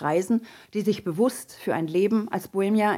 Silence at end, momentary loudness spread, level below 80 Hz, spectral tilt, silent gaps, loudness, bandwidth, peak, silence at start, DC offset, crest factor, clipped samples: 0 s; 6 LU; -70 dBFS; -6 dB/octave; none; -26 LUFS; 16 kHz; -10 dBFS; 0 s; under 0.1%; 14 dB; under 0.1%